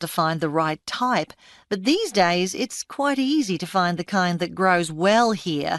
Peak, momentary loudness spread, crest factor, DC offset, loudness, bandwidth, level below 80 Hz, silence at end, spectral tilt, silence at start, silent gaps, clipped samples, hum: -6 dBFS; 6 LU; 16 dB; under 0.1%; -22 LUFS; 12.5 kHz; -62 dBFS; 0 s; -4.5 dB/octave; 0 s; none; under 0.1%; none